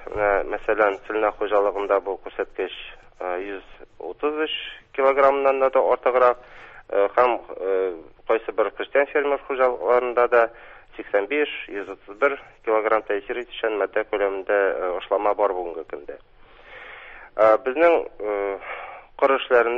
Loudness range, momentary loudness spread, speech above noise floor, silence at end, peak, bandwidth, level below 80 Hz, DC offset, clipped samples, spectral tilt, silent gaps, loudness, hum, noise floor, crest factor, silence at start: 5 LU; 17 LU; 24 dB; 0 s; -4 dBFS; 5.4 kHz; -54 dBFS; under 0.1%; under 0.1%; -5.5 dB/octave; none; -22 LUFS; none; -46 dBFS; 18 dB; 0 s